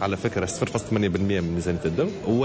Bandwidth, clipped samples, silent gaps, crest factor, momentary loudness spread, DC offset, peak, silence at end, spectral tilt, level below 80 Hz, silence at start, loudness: 8 kHz; under 0.1%; none; 12 dB; 3 LU; under 0.1%; -12 dBFS; 0 s; -6 dB/octave; -42 dBFS; 0 s; -25 LUFS